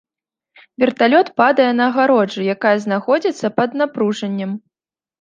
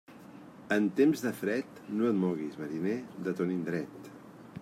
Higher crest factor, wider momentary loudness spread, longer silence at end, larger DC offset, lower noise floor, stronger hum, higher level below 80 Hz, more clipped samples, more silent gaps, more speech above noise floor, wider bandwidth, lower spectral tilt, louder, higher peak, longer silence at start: about the same, 16 dB vs 18 dB; second, 9 LU vs 23 LU; first, 0.65 s vs 0 s; neither; first, under -90 dBFS vs -50 dBFS; neither; first, -68 dBFS vs -76 dBFS; neither; neither; first, over 74 dB vs 20 dB; second, 8.8 kHz vs 16 kHz; about the same, -6 dB/octave vs -7 dB/octave; first, -16 LUFS vs -32 LUFS; first, -2 dBFS vs -14 dBFS; first, 0.8 s vs 0.1 s